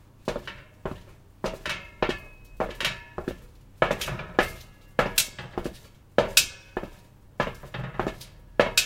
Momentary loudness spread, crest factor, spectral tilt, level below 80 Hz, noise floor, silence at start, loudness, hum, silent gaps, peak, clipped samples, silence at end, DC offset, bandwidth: 17 LU; 30 dB; -2.5 dB/octave; -46 dBFS; -51 dBFS; 0.25 s; -28 LUFS; none; none; 0 dBFS; under 0.1%; 0 s; under 0.1%; 17 kHz